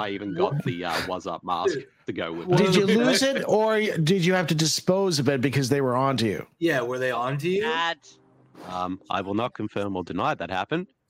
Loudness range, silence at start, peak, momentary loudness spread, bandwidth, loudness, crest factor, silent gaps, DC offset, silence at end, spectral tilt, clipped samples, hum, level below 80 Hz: 7 LU; 0 s; -6 dBFS; 11 LU; 16 kHz; -24 LUFS; 18 dB; none; under 0.1%; 0.25 s; -5 dB/octave; under 0.1%; none; -62 dBFS